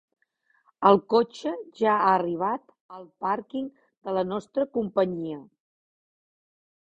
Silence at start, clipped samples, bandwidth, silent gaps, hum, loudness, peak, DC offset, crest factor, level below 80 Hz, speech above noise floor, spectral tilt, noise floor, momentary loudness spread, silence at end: 0.8 s; under 0.1%; 8.2 kHz; 2.80-2.89 s, 3.97-4.01 s; none; -26 LUFS; -4 dBFS; under 0.1%; 24 dB; -68 dBFS; 44 dB; -7 dB/octave; -69 dBFS; 16 LU; 1.5 s